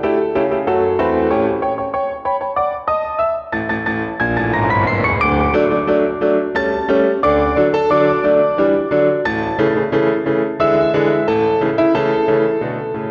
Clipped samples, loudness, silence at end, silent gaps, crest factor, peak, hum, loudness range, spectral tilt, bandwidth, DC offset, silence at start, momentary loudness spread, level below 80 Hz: under 0.1%; -16 LUFS; 0 s; none; 12 dB; -4 dBFS; none; 3 LU; -8.5 dB/octave; 6.8 kHz; under 0.1%; 0 s; 6 LU; -38 dBFS